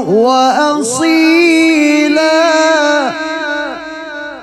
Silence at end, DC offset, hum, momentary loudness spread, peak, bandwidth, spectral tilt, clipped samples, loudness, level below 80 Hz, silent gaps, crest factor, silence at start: 0 s; under 0.1%; none; 13 LU; 0 dBFS; 13 kHz; -3 dB/octave; under 0.1%; -10 LUFS; -54 dBFS; none; 10 dB; 0 s